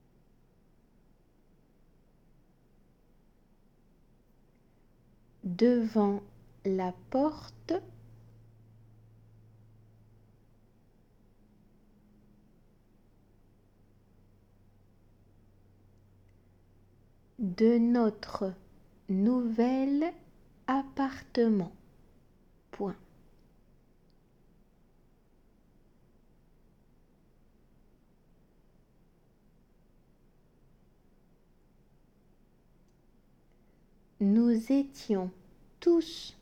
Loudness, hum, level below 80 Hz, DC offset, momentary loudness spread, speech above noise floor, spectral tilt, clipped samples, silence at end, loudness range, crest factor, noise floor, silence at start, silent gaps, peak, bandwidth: -30 LUFS; none; -64 dBFS; under 0.1%; 16 LU; 36 dB; -7.5 dB/octave; under 0.1%; 0.1 s; 16 LU; 22 dB; -64 dBFS; 5.45 s; none; -14 dBFS; 9 kHz